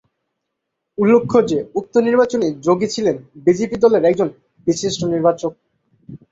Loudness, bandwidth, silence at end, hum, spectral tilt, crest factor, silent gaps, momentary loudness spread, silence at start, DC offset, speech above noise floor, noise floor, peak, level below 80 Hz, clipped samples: -17 LUFS; 7.8 kHz; 0.15 s; none; -5.5 dB/octave; 16 dB; none; 8 LU; 1 s; under 0.1%; 61 dB; -77 dBFS; -2 dBFS; -56 dBFS; under 0.1%